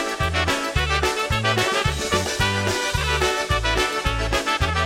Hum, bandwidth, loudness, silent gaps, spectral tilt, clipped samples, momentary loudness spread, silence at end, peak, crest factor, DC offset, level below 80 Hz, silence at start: none; 16.5 kHz; -21 LUFS; none; -3.5 dB/octave; under 0.1%; 2 LU; 0 s; -6 dBFS; 16 dB; under 0.1%; -30 dBFS; 0 s